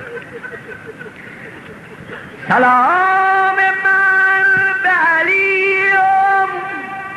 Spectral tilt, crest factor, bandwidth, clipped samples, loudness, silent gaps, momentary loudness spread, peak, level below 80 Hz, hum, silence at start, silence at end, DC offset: -5 dB/octave; 12 dB; 12.5 kHz; under 0.1%; -12 LUFS; none; 21 LU; -4 dBFS; -60 dBFS; none; 0 s; 0 s; under 0.1%